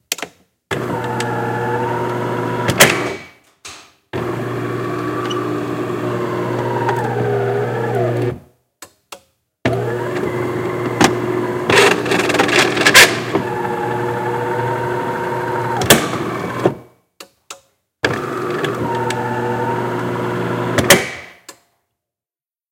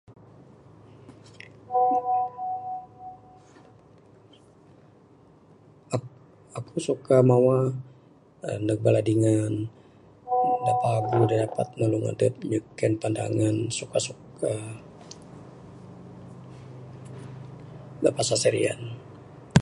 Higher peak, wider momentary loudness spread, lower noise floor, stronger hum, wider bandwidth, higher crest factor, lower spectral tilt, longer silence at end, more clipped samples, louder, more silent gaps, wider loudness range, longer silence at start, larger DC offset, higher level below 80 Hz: about the same, 0 dBFS vs -2 dBFS; second, 13 LU vs 23 LU; first, under -90 dBFS vs -55 dBFS; neither; first, 17 kHz vs 11.5 kHz; second, 18 dB vs 26 dB; second, -3.5 dB/octave vs -6 dB/octave; first, 1.2 s vs 0 s; first, 0.1% vs under 0.1%; first, -17 LUFS vs -25 LUFS; neither; second, 9 LU vs 16 LU; about the same, 0.1 s vs 0.1 s; neither; first, -50 dBFS vs -58 dBFS